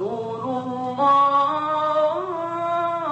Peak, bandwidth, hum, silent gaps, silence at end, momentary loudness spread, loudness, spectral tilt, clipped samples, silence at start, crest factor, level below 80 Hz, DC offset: -8 dBFS; 8.6 kHz; none; none; 0 s; 10 LU; -21 LUFS; -6.5 dB/octave; under 0.1%; 0 s; 14 dB; -66 dBFS; under 0.1%